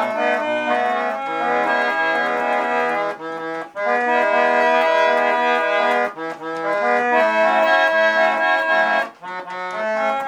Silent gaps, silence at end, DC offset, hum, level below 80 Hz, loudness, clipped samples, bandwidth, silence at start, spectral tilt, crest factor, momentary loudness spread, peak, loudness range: none; 0 s; under 0.1%; none; -78 dBFS; -18 LUFS; under 0.1%; 11.5 kHz; 0 s; -3.5 dB/octave; 14 dB; 12 LU; -4 dBFS; 3 LU